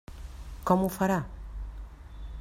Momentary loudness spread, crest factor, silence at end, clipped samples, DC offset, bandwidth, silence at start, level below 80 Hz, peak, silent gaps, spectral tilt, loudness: 20 LU; 22 dB; 0 s; under 0.1%; under 0.1%; 16 kHz; 0.1 s; -42 dBFS; -10 dBFS; none; -7 dB/octave; -28 LUFS